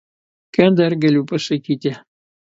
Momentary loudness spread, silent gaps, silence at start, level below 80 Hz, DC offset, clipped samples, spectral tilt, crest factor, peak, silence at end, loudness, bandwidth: 10 LU; none; 0.6 s; -60 dBFS; under 0.1%; under 0.1%; -7 dB/octave; 18 dB; 0 dBFS; 0.55 s; -17 LUFS; 7.8 kHz